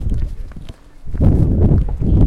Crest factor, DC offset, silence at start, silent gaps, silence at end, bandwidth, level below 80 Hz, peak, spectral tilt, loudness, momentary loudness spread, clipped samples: 14 dB; under 0.1%; 0 s; none; 0 s; 4.5 kHz; -18 dBFS; 0 dBFS; -11 dB/octave; -16 LUFS; 20 LU; under 0.1%